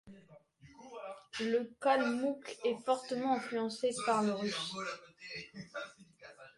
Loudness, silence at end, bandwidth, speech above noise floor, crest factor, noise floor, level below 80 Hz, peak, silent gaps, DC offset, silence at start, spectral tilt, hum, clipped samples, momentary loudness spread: -36 LUFS; 0.1 s; 11.5 kHz; 26 dB; 20 dB; -61 dBFS; -78 dBFS; -16 dBFS; none; under 0.1%; 0.05 s; -4 dB/octave; none; under 0.1%; 16 LU